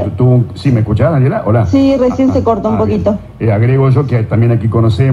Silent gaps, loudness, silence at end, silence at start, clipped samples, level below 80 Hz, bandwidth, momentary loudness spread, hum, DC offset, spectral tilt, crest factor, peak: none; -11 LUFS; 0 s; 0 s; under 0.1%; -36 dBFS; 7.2 kHz; 3 LU; none; under 0.1%; -9.5 dB/octave; 10 dB; 0 dBFS